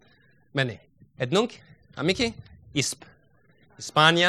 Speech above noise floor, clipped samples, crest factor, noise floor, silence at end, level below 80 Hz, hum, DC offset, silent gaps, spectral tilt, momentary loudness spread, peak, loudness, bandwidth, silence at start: 37 dB; under 0.1%; 26 dB; -61 dBFS; 0 s; -58 dBFS; none; under 0.1%; none; -3.5 dB/octave; 18 LU; -2 dBFS; -26 LUFS; 14 kHz; 0.55 s